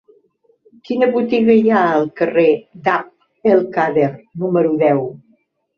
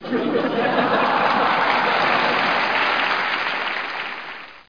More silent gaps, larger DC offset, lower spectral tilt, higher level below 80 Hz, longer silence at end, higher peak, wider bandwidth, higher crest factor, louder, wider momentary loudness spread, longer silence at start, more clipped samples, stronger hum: neither; second, under 0.1% vs 0.4%; first, -8.5 dB/octave vs -5 dB/octave; first, -60 dBFS vs -66 dBFS; first, 0.6 s vs 0.1 s; about the same, -2 dBFS vs -4 dBFS; first, 6.4 kHz vs 5.4 kHz; about the same, 14 dB vs 18 dB; first, -16 LUFS vs -19 LUFS; about the same, 8 LU vs 8 LU; first, 0.9 s vs 0 s; neither; neither